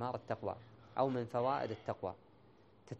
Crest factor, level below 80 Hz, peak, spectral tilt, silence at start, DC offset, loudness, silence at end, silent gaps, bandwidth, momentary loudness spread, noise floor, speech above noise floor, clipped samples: 20 dB; -74 dBFS; -20 dBFS; -8 dB/octave; 0 s; under 0.1%; -39 LUFS; 0 s; none; 8.8 kHz; 10 LU; -65 dBFS; 26 dB; under 0.1%